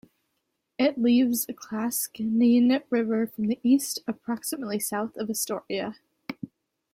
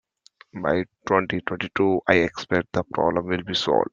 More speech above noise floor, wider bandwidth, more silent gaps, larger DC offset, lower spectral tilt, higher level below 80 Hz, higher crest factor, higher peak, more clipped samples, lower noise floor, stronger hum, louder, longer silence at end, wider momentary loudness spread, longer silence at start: first, 53 dB vs 32 dB; first, 16.5 kHz vs 7.6 kHz; neither; neither; second, -4 dB/octave vs -5.5 dB/octave; second, -70 dBFS vs -56 dBFS; second, 16 dB vs 24 dB; second, -12 dBFS vs 0 dBFS; neither; first, -78 dBFS vs -55 dBFS; neither; second, -26 LUFS vs -23 LUFS; first, 0.45 s vs 0.05 s; first, 17 LU vs 7 LU; first, 0.8 s vs 0.55 s